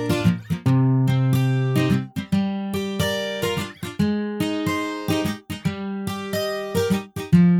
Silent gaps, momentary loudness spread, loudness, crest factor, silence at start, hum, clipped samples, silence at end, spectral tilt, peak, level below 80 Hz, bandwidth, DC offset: none; 8 LU; -23 LUFS; 18 dB; 0 s; none; under 0.1%; 0 s; -6.5 dB/octave; -4 dBFS; -50 dBFS; 17 kHz; under 0.1%